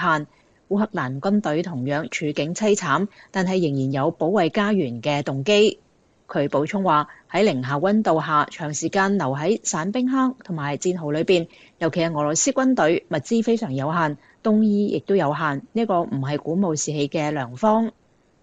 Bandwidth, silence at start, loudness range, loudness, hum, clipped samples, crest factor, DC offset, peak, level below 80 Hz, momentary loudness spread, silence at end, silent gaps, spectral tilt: 9.2 kHz; 0 s; 2 LU; -22 LUFS; none; under 0.1%; 16 dB; under 0.1%; -6 dBFS; -62 dBFS; 7 LU; 0.5 s; none; -5 dB/octave